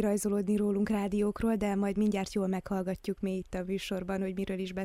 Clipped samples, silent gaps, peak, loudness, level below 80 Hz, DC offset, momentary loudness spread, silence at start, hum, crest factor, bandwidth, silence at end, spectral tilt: under 0.1%; none; -18 dBFS; -32 LUFS; -52 dBFS; under 0.1%; 6 LU; 0 s; none; 14 dB; 15 kHz; 0 s; -6.5 dB/octave